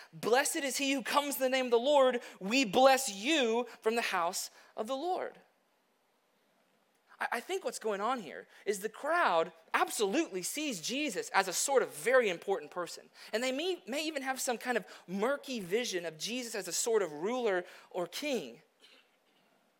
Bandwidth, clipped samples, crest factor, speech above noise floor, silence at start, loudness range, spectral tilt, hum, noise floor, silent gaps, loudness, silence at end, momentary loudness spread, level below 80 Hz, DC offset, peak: 16.5 kHz; under 0.1%; 22 dB; 41 dB; 0 s; 10 LU; -2.5 dB/octave; none; -74 dBFS; none; -32 LUFS; 1.2 s; 10 LU; -86 dBFS; under 0.1%; -10 dBFS